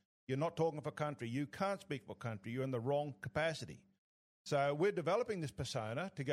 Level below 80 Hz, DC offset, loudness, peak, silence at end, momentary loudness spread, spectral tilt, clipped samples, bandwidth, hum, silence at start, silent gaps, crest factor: -72 dBFS; under 0.1%; -39 LUFS; -22 dBFS; 0 s; 10 LU; -6 dB/octave; under 0.1%; 14 kHz; none; 0.3 s; 3.98-4.45 s; 16 dB